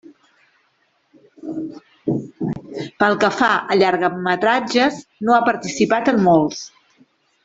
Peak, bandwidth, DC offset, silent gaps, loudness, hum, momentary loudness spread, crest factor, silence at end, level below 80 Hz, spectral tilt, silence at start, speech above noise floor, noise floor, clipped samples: 0 dBFS; 8 kHz; under 0.1%; none; -18 LUFS; none; 15 LU; 20 dB; 0.75 s; -58 dBFS; -5 dB/octave; 1.45 s; 47 dB; -64 dBFS; under 0.1%